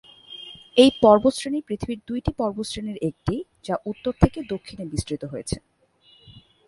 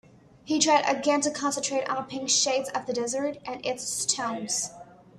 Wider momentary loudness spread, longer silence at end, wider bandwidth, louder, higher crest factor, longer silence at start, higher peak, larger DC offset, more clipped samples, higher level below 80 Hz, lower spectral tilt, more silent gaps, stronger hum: first, 16 LU vs 9 LU; about the same, 0.3 s vs 0.3 s; second, 11.5 kHz vs 13.5 kHz; first, -23 LUFS vs -26 LUFS; about the same, 22 dB vs 20 dB; second, 0.3 s vs 0.45 s; first, -2 dBFS vs -8 dBFS; neither; neither; first, -40 dBFS vs -68 dBFS; first, -6 dB/octave vs -1.5 dB/octave; neither; neither